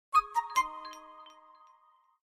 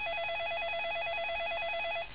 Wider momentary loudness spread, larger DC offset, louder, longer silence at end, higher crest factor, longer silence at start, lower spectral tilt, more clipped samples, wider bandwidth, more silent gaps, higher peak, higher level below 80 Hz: first, 24 LU vs 0 LU; second, under 0.1% vs 0.4%; first, -31 LUFS vs -34 LUFS; first, 0.95 s vs 0 s; first, 20 dB vs 8 dB; first, 0.15 s vs 0 s; first, 0 dB/octave vs 1.5 dB/octave; neither; first, 16 kHz vs 4 kHz; neither; first, -14 dBFS vs -26 dBFS; second, -66 dBFS vs -60 dBFS